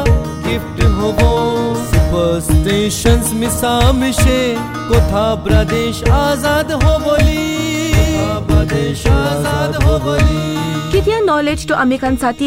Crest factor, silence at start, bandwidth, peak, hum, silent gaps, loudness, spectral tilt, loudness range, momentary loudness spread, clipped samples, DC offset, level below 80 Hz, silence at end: 10 dB; 0 s; 16 kHz; -2 dBFS; none; none; -14 LUFS; -5.5 dB/octave; 1 LU; 4 LU; under 0.1%; 0.1%; -20 dBFS; 0 s